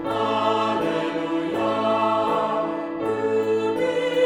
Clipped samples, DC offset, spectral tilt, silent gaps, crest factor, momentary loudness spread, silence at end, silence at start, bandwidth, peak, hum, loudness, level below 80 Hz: under 0.1%; under 0.1%; -5.5 dB/octave; none; 14 dB; 4 LU; 0 s; 0 s; 14.5 kHz; -8 dBFS; none; -23 LUFS; -62 dBFS